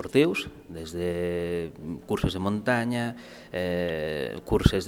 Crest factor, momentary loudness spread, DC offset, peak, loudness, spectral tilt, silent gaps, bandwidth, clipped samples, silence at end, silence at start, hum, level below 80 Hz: 24 dB; 13 LU; under 0.1%; -2 dBFS; -28 LUFS; -6 dB/octave; none; 17 kHz; under 0.1%; 0 s; 0 s; none; -42 dBFS